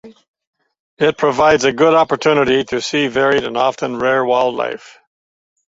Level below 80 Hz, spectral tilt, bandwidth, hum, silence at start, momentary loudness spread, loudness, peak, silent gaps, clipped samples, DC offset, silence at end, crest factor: -52 dBFS; -4.5 dB/octave; 8 kHz; none; 0.05 s; 6 LU; -15 LUFS; -2 dBFS; 0.28-0.34 s, 0.47-0.53 s, 0.80-0.97 s; under 0.1%; under 0.1%; 1 s; 16 dB